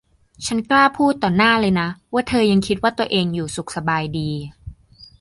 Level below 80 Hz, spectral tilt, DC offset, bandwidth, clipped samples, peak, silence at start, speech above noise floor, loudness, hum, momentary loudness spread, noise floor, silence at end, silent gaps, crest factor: -46 dBFS; -5 dB/octave; under 0.1%; 11.5 kHz; under 0.1%; -2 dBFS; 0.4 s; 27 dB; -19 LUFS; none; 11 LU; -46 dBFS; 0.15 s; none; 16 dB